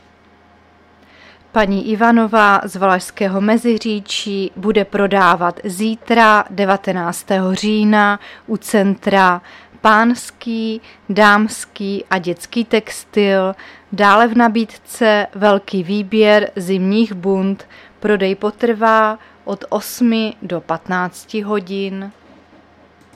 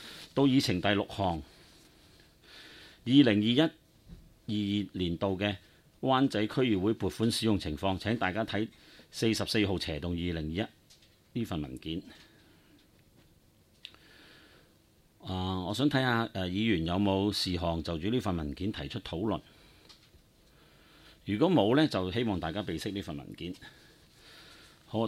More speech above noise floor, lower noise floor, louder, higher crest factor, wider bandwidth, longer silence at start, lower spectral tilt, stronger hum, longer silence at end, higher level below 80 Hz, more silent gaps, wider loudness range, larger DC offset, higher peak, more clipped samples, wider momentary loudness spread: about the same, 33 dB vs 34 dB; second, -49 dBFS vs -64 dBFS; first, -15 LUFS vs -31 LUFS; second, 16 dB vs 22 dB; about the same, 14.5 kHz vs 15.5 kHz; first, 1.55 s vs 0 s; about the same, -5 dB/octave vs -6 dB/octave; neither; first, 1.05 s vs 0 s; about the same, -52 dBFS vs -54 dBFS; neither; second, 3 LU vs 10 LU; neither; first, 0 dBFS vs -10 dBFS; neither; second, 12 LU vs 16 LU